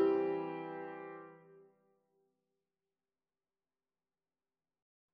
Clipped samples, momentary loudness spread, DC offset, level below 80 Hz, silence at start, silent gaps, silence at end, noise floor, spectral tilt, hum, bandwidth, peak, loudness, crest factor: under 0.1%; 22 LU; under 0.1%; -88 dBFS; 0 s; none; 3.5 s; under -90 dBFS; -5.5 dB/octave; none; 5.2 kHz; -22 dBFS; -39 LUFS; 20 dB